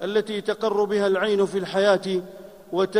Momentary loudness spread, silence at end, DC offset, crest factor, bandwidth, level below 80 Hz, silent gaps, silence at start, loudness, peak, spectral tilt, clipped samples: 8 LU; 0 s; under 0.1%; 16 dB; 15 kHz; -66 dBFS; none; 0 s; -23 LUFS; -6 dBFS; -5.5 dB/octave; under 0.1%